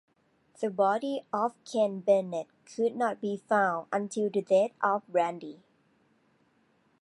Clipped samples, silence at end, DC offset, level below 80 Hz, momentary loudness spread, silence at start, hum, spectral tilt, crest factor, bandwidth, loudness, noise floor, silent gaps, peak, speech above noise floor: under 0.1%; 1.45 s; under 0.1%; -84 dBFS; 10 LU; 0.6 s; none; -5.5 dB/octave; 18 dB; 11.5 kHz; -29 LUFS; -69 dBFS; none; -12 dBFS; 40 dB